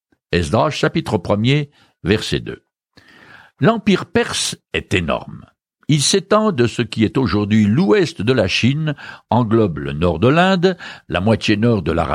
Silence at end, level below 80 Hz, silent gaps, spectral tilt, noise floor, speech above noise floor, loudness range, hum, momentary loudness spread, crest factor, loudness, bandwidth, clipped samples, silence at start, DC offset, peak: 0 s; -42 dBFS; none; -5.5 dB/octave; -51 dBFS; 34 dB; 4 LU; none; 10 LU; 16 dB; -17 LUFS; 15.5 kHz; under 0.1%; 0.3 s; under 0.1%; -2 dBFS